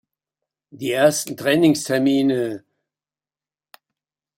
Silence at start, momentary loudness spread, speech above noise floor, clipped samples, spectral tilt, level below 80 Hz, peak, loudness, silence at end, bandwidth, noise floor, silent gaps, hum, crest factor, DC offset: 0.75 s; 11 LU; over 72 dB; under 0.1%; -4.5 dB/octave; -66 dBFS; -2 dBFS; -19 LUFS; 1.8 s; 16.5 kHz; under -90 dBFS; none; none; 20 dB; under 0.1%